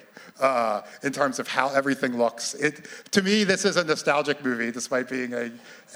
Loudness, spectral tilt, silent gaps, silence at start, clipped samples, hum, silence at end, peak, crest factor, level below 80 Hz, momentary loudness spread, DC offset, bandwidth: -25 LUFS; -3.5 dB/octave; none; 0.15 s; under 0.1%; none; 0 s; -2 dBFS; 22 dB; -76 dBFS; 8 LU; under 0.1%; over 20 kHz